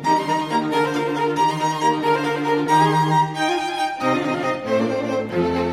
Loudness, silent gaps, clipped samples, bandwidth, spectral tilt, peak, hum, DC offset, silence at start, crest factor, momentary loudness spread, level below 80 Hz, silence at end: -20 LUFS; none; under 0.1%; 15.5 kHz; -5.5 dB/octave; -6 dBFS; none; under 0.1%; 0 s; 14 dB; 5 LU; -56 dBFS; 0 s